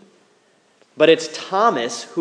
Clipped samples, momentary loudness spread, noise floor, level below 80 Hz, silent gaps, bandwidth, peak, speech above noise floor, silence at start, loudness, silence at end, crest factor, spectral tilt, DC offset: under 0.1%; 9 LU; -58 dBFS; -78 dBFS; none; 10.5 kHz; 0 dBFS; 40 dB; 1 s; -18 LUFS; 0 s; 20 dB; -3.5 dB/octave; under 0.1%